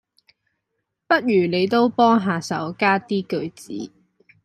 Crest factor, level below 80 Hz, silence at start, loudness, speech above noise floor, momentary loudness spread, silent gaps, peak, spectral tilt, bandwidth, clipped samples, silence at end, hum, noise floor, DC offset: 18 dB; -66 dBFS; 1.1 s; -20 LUFS; 58 dB; 16 LU; none; -4 dBFS; -6 dB/octave; 13.5 kHz; under 0.1%; 0.55 s; none; -77 dBFS; under 0.1%